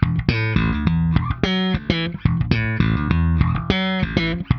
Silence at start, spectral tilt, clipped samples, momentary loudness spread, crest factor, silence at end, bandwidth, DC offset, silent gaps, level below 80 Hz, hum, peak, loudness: 0 s; -8 dB/octave; under 0.1%; 2 LU; 18 dB; 0 s; 6.6 kHz; under 0.1%; none; -28 dBFS; none; 0 dBFS; -20 LUFS